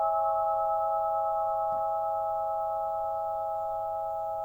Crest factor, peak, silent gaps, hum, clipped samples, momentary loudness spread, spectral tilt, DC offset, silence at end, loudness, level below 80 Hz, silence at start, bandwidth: 12 dB; -18 dBFS; none; none; under 0.1%; 5 LU; -6.5 dB/octave; under 0.1%; 0 s; -30 LUFS; -62 dBFS; 0 s; 17 kHz